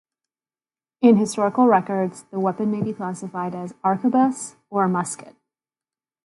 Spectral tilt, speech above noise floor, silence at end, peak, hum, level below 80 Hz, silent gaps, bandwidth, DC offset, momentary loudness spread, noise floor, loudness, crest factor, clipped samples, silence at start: -6.5 dB/octave; over 69 dB; 1 s; -4 dBFS; none; -70 dBFS; none; 11.5 kHz; under 0.1%; 13 LU; under -90 dBFS; -21 LUFS; 18 dB; under 0.1%; 1 s